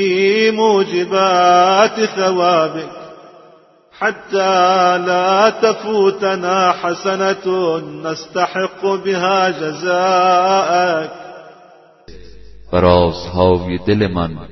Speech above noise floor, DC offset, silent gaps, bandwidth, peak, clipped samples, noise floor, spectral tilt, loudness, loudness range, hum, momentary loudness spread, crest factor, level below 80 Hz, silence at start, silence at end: 32 dB; under 0.1%; none; 6.2 kHz; 0 dBFS; under 0.1%; -47 dBFS; -5 dB/octave; -15 LUFS; 3 LU; none; 9 LU; 16 dB; -44 dBFS; 0 s; 0.05 s